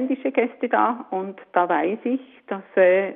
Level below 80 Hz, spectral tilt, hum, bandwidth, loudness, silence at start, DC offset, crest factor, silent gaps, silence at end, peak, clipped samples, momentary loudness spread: -76 dBFS; -4 dB/octave; none; 3.8 kHz; -22 LUFS; 0 s; under 0.1%; 16 dB; none; 0 s; -6 dBFS; under 0.1%; 12 LU